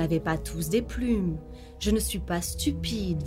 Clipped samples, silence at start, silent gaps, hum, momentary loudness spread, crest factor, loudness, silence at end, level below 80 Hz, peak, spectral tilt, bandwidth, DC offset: under 0.1%; 0 s; none; none; 5 LU; 16 dB; -29 LUFS; 0 s; -38 dBFS; -12 dBFS; -5 dB/octave; 16 kHz; under 0.1%